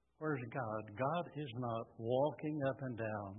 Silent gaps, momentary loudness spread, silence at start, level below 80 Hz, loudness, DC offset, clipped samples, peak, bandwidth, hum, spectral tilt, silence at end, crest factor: none; 7 LU; 0.2 s; -76 dBFS; -40 LUFS; under 0.1%; under 0.1%; -24 dBFS; 3.8 kHz; none; -4.5 dB/octave; 0 s; 16 dB